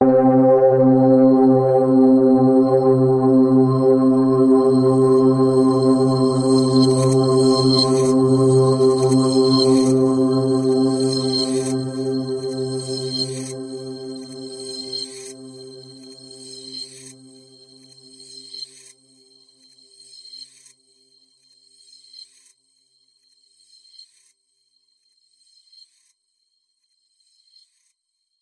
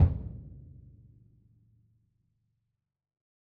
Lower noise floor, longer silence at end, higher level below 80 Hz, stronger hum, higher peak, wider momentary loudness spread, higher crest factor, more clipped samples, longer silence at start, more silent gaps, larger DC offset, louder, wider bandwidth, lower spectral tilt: second, -75 dBFS vs -84 dBFS; first, 8.05 s vs 2.85 s; second, -62 dBFS vs -42 dBFS; neither; first, -4 dBFS vs -10 dBFS; second, 20 LU vs 24 LU; second, 14 dB vs 24 dB; neither; about the same, 0 s vs 0 s; neither; neither; first, -16 LUFS vs -33 LUFS; first, 11.5 kHz vs 2.5 kHz; second, -6.5 dB/octave vs -11.5 dB/octave